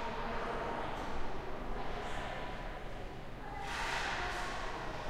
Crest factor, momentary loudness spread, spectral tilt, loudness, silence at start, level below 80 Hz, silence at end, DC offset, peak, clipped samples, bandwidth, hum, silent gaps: 14 dB; 10 LU; -4 dB/octave; -41 LUFS; 0 s; -46 dBFS; 0 s; under 0.1%; -26 dBFS; under 0.1%; 13 kHz; none; none